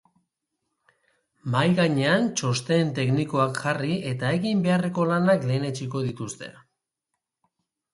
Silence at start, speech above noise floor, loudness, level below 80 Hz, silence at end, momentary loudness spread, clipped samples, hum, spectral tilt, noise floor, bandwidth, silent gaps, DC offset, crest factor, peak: 1.45 s; 59 dB; -24 LUFS; -64 dBFS; 1.45 s; 9 LU; under 0.1%; none; -6 dB/octave; -83 dBFS; 11.5 kHz; none; under 0.1%; 18 dB; -6 dBFS